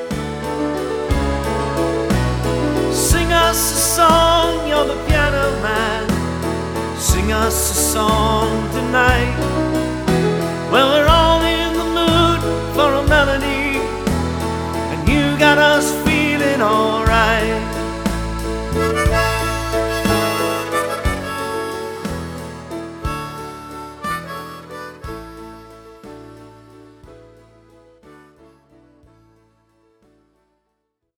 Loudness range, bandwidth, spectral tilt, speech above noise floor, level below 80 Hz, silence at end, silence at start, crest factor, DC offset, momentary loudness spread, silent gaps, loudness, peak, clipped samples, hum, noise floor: 14 LU; over 20 kHz; -4 dB/octave; 57 dB; -28 dBFS; 4 s; 0 s; 18 dB; under 0.1%; 16 LU; none; -17 LUFS; 0 dBFS; under 0.1%; none; -73 dBFS